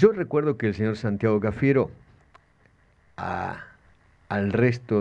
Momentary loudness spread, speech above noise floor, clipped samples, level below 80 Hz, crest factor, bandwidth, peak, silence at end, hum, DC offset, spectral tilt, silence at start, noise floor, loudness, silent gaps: 10 LU; 37 dB; under 0.1%; -54 dBFS; 20 dB; 8 kHz; -4 dBFS; 0 s; none; under 0.1%; -8.5 dB/octave; 0 s; -60 dBFS; -25 LUFS; none